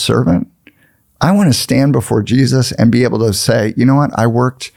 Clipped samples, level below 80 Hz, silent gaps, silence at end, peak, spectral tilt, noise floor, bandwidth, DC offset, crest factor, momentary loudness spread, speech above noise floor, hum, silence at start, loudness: under 0.1%; -44 dBFS; none; 0.1 s; 0 dBFS; -6 dB/octave; -54 dBFS; 16.5 kHz; under 0.1%; 12 dB; 4 LU; 42 dB; none; 0 s; -12 LUFS